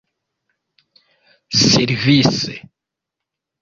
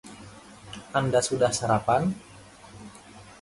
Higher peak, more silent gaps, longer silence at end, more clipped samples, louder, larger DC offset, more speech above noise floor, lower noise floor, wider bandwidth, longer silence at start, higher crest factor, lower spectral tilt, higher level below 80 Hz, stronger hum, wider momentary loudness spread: first, -2 dBFS vs -10 dBFS; neither; first, 1.05 s vs 0.1 s; neither; first, -15 LUFS vs -25 LUFS; neither; first, 68 dB vs 24 dB; first, -83 dBFS vs -48 dBFS; second, 7.6 kHz vs 11.5 kHz; first, 1.5 s vs 0.05 s; about the same, 18 dB vs 18 dB; about the same, -4 dB/octave vs -4.5 dB/octave; first, -50 dBFS vs -56 dBFS; neither; second, 12 LU vs 24 LU